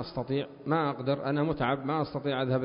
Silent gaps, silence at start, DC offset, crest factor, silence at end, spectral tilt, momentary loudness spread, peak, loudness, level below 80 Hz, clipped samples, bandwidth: none; 0 s; under 0.1%; 16 dB; 0 s; -11 dB/octave; 4 LU; -14 dBFS; -30 LUFS; -58 dBFS; under 0.1%; 5.4 kHz